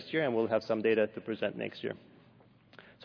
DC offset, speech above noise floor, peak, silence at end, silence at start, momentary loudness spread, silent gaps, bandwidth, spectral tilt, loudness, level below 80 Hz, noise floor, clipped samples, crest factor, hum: under 0.1%; 29 dB; -16 dBFS; 0 s; 0 s; 11 LU; none; 5.4 kHz; -7.5 dB/octave; -32 LUFS; -78 dBFS; -61 dBFS; under 0.1%; 18 dB; none